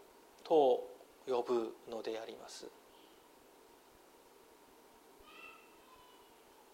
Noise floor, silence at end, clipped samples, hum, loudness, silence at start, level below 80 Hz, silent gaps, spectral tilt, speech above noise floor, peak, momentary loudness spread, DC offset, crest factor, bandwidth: -63 dBFS; 1.2 s; under 0.1%; none; -36 LUFS; 0.45 s; -80 dBFS; none; -4.5 dB/octave; 28 dB; -18 dBFS; 29 LU; under 0.1%; 22 dB; 16 kHz